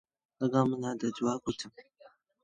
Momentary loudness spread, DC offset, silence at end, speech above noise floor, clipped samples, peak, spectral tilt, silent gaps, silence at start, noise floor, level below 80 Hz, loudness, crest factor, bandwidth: 11 LU; under 0.1%; 0.6 s; 30 dB; under 0.1%; -12 dBFS; -6 dB/octave; none; 0.4 s; -61 dBFS; -70 dBFS; -32 LUFS; 22 dB; 9.4 kHz